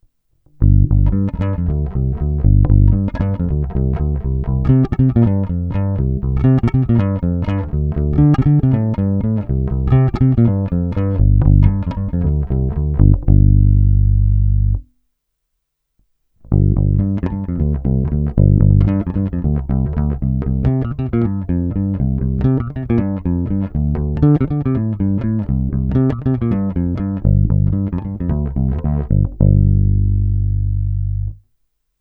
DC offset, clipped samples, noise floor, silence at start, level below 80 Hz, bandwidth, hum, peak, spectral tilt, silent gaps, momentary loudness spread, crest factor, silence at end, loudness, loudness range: under 0.1%; under 0.1%; -73 dBFS; 0.6 s; -20 dBFS; 3.5 kHz; none; 0 dBFS; -12 dB/octave; none; 7 LU; 14 dB; 0.65 s; -17 LUFS; 3 LU